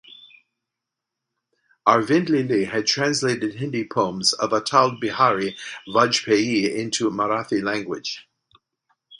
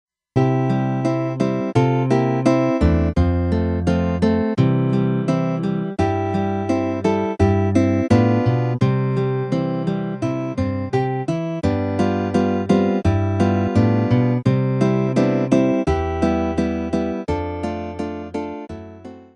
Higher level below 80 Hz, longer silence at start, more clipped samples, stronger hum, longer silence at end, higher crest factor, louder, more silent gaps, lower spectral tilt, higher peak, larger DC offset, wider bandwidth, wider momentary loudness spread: second, -64 dBFS vs -36 dBFS; second, 0.1 s vs 0.35 s; neither; neither; about the same, 0.05 s vs 0.1 s; first, 22 dB vs 16 dB; about the same, -21 LUFS vs -20 LUFS; neither; second, -4 dB/octave vs -8.5 dB/octave; first, 0 dBFS vs -4 dBFS; neither; first, 11 kHz vs 9.6 kHz; about the same, 8 LU vs 7 LU